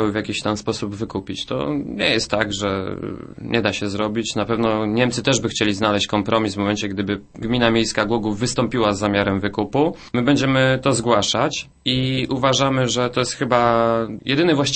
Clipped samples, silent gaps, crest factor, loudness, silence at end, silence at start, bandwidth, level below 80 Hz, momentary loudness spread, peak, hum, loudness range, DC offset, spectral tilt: under 0.1%; none; 18 dB; -20 LUFS; 0 s; 0 s; 8.8 kHz; -46 dBFS; 8 LU; -2 dBFS; none; 4 LU; under 0.1%; -4.5 dB/octave